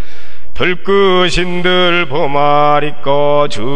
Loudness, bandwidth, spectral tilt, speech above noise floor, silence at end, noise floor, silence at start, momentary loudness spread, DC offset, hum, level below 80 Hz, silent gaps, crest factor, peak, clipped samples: -12 LUFS; 10.5 kHz; -5 dB/octave; 26 dB; 0 s; -38 dBFS; 0 s; 5 LU; 30%; none; -32 dBFS; none; 14 dB; 0 dBFS; under 0.1%